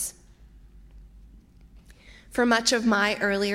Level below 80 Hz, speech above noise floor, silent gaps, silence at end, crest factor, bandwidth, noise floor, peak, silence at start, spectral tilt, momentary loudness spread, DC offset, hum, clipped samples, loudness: -52 dBFS; 29 dB; none; 0 s; 22 dB; 16 kHz; -52 dBFS; -6 dBFS; 0 s; -3 dB/octave; 11 LU; under 0.1%; none; under 0.1%; -23 LUFS